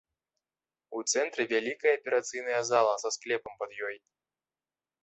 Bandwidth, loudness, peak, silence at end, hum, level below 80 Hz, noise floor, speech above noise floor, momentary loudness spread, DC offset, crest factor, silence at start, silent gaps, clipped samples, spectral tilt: 8.4 kHz; -30 LUFS; -12 dBFS; 1.05 s; none; -80 dBFS; under -90 dBFS; over 60 dB; 12 LU; under 0.1%; 20 dB; 0.9 s; none; under 0.1%; -1.5 dB/octave